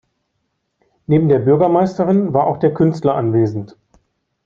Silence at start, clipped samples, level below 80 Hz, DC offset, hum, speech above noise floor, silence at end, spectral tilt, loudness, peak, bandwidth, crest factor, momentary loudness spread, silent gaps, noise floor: 1.1 s; under 0.1%; -54 dBFS; under 0.1%; none; 56 dB; 0.8 s; -10 dB/octave; -15 LUFS; 0 dBFS; 7.4 kHz; 16 dB; 8 LU; none; -70 dBFS